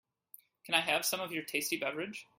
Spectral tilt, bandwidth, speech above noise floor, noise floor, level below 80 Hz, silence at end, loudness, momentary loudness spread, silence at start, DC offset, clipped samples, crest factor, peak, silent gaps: -1.5 dB/octave; 16.5 kHz; 26 dB; -61 dBFS; -80 dBFS; 0.15 s; -33 LUFS; 9 LU; 0.65 s; under 0.1%; under 0.1%; 26 dB; -12 dBFS; none